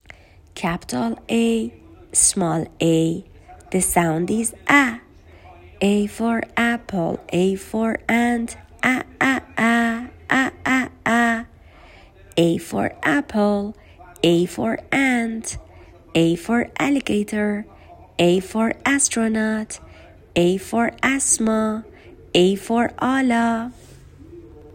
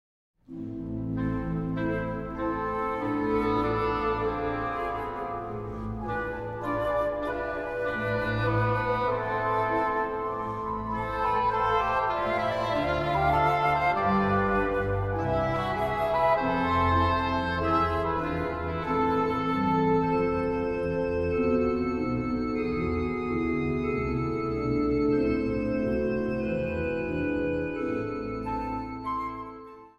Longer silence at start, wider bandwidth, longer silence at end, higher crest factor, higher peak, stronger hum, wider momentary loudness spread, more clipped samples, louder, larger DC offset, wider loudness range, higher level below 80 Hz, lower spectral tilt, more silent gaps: about the same, 0.55 s vs 0.5 s; first, 16.5 kHz vs 13 kHz; about the same, 0 s vs 0.1 s; first, 20 dB vs 14 dB; first, -2 dBFS vs -12 dBFS; neither; about the same, 9 LU vs 8 LU; neither; first, -20 LUFS vs -28 LUFS; neither; second, 2 LU vs 5 LU; about the same, -48 dBFS vs -44 dBFS; second, -4 dB/octave vs -8 dB/octave; neither